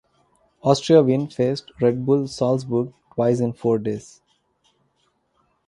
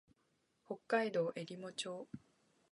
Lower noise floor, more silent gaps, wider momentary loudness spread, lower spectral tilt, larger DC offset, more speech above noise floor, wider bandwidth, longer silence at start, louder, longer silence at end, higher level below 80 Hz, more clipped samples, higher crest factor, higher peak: second, -68 dBFS vs -80 dBFS; neither; second, 10 LU vs 16 LU; first, -7 dB/octave vs -4.5 dB/octave; neither; first, 48 dB vs 40 dB; about the same, 11 kHz vs 11.5 kHz; about the same, 0.65 s vs 0.7 s; first, -21 LUFS vs -41 LUFS; first, 1.7 s vs 0.55 s; first, -60 dBFS vs -84 dBFS; neither; about the same, 22 dB vs 24 dB; first, -2 dBFS vs -20 dBFS